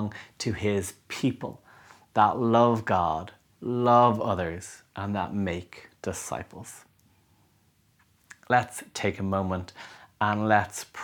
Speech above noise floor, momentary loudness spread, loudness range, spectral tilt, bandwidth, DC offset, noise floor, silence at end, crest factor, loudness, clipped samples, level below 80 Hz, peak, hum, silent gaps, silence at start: 39 dB; 19 LU; 11 LU; -5.5 dB/octave; 20 kHz; under 0.1%; -65 dBFS; 0 s; 22 dB; -27 LUFS; under 0.1%; -58 dBFS; -6 dBFS; none; none; 0 s